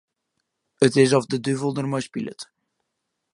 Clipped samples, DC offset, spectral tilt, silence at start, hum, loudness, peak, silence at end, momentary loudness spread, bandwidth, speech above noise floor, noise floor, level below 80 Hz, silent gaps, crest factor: under 0.1%; under 0.1%; -5.5 dB/octave; 0.8 s; none; -22 LUFS; -2 dBFS; 0.9 s; 17 LU; 11.5 kHz; 58 dB; -79 dBFS; -68 dBFS; none; 22 dB